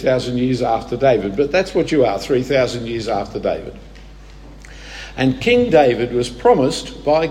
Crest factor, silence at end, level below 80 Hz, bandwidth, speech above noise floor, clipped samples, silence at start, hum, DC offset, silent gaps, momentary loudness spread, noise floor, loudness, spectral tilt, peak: 16 dB; 0 s; -40 dBFS; 13 kHz; 22 dB; under 0.1%; 0 s; none; under 0.1%; none; 10 LU; -38 dBFS; -17 LUFS; -6 dB/octave; 0 dBFS